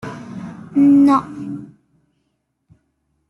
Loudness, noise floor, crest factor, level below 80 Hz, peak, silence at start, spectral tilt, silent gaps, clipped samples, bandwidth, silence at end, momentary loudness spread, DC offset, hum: -14 LUFS; -70 dBFS; 14 dB; -60 dBFS; -4 dBFS; 0.05 s; -8 dB/octave; none; under 0.1%; 6.4 kHz; 1.65 s; 21 LU; under 0.1%; none